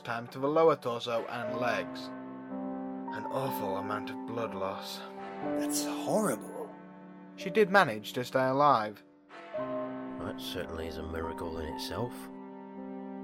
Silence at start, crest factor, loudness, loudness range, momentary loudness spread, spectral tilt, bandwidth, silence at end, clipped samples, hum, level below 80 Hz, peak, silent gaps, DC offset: 0 s; 24 dB; -32 LUFS; 8 LU; 18 LU; -4.5 dB/octave; 16 kHz; 0 s; under 0.1%; none; -58 dBFS; -10 dBFS; none; under 0.1%